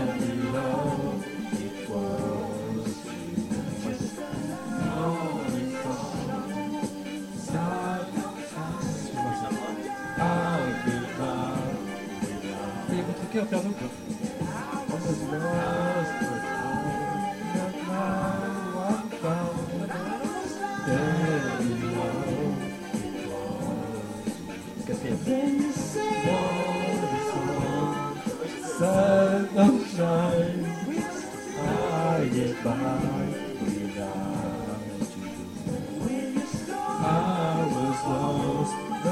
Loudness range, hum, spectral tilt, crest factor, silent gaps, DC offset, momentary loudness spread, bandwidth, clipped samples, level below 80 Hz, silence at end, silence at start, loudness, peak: 7 LU; none; -6 dB/octave; 20 dB; none; under 0.1%; 8 LU; 16 kHz; under 0.1%; -54 dBFS; 0 s; 0 s; -29 LUFS; -8 dBFS